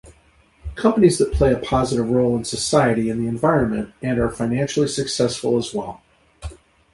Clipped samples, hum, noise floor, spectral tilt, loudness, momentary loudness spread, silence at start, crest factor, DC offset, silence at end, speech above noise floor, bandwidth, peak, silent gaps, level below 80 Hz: under 0.1%; none; -55 dBFS; -5.5 dB/octave; -20 LUFS; 18 LU; 0.05 s; 18 dB; under 0.1%; 0.4 s; 36 dB; 11.5 kHz; -2 dBFS; none; -36 dBFS